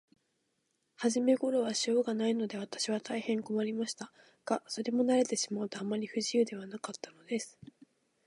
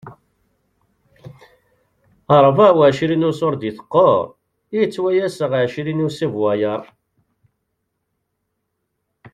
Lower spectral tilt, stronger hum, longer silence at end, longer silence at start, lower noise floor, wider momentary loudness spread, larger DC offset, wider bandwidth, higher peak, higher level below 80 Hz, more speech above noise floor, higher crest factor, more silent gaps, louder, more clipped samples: second, -4 dB/octave vs -7 dB/octave; neither; first, 0.75 s vs 0.05 s; first, 1 s vs 0.05 s; first, -79 dBFS vs -74 dBFS; about the same, 13 LU vs 11 LU; neither; about the same, 11.5 kHz vs 11.5 kHz; second, -16 dBFS vs -2 dBFS; second, -84 dBFS vs -58 dBFS; second, 47 dB vs 58 dB; about the same, 18 dB vs 18 dB; neither; second, -33 LUFS vs -17 LUFS; neither